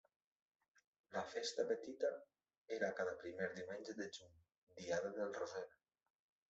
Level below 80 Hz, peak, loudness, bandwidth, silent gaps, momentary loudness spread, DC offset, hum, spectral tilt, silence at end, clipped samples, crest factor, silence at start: -86 dBFS; -26 dBFS; -45 LUFS; 8 kHz; 2.58-2.66 s, 4.57-4.67 s; 11 LU; under 0.1%; none; -2.5 dB/octave; 0.8 s; under 0.1%; 20 dB; 1.1 s